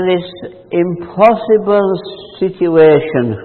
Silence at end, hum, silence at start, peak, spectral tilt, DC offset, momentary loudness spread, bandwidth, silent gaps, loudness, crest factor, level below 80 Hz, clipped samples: 0 s; none; 0 s; 0 dBFS; -9.5 dB/octave; under 0.1%; 13 LU; 4.4 kHz; none; -13 LUFS; 12 dB; -52 dBFS; under 0.1%